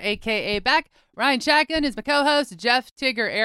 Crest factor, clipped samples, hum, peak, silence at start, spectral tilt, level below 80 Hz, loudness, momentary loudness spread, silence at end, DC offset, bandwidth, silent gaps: 18 dB; under 0.1%; none; -4 dBFS; 0 s; -3 dB/octave; -50 dBFS; -21 LUFS; 5 LU; 0 s; under 0.1%; 16 kHz; 2.91-2.96 s